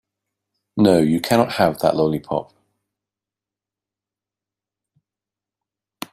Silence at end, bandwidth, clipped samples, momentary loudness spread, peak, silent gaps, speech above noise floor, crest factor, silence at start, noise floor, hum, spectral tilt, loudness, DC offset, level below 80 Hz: 3.7 s; 16 kHz; under 0.1%; 12 LU; -2 dBFS; none; 71 dB; 20 dB; 0.75 s; -89 dBFS; none; -6 dB/octave; -18 LUFS; under 0.1%; -56 dBFS